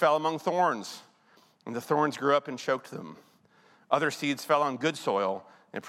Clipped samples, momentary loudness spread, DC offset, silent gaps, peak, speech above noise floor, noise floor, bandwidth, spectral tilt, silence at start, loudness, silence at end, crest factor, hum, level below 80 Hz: under 0.1%; 16 LU; under 0.1%; none; -8 dBFS; 34 dB; -62 dBFS; 16 kHz; -4.5 dB/octave; 0 s; -29 LUFS; 0 s; 22 dB; none; -84 dBFS